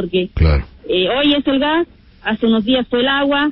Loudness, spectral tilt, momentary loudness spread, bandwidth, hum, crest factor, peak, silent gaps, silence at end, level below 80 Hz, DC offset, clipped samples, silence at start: -16 LUFS; -11 dB/octave; 7 LU; 5.6 kHz; none; 14 dB; -2 dBFS; none; 0 s; -26 dBFS; under 0.1%; under 0.1%; 0 s